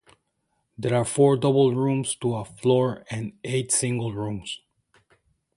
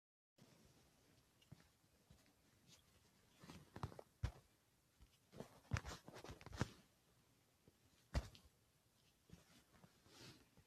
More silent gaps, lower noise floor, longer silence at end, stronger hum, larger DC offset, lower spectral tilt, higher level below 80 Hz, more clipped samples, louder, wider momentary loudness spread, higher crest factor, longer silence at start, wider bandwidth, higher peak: neither; second, -74 dBFS vs -78 dBFS; first, 1 s vs 0.05 s; neither; neither; about the same, -5.5 dB/octave vs -5 dB/octave; about the same, -58 dBFS vs -62 dBFS; neither; first, -24 LUFS vs -53 LUFS; second, 13 LU vs 20 LU; second, 18 dB vs 30 dB; first, 0.8 s vs 0.4 s; second, 11.5 kHz vs 14 kHz; first, -6 dBFS vs -26 dBFS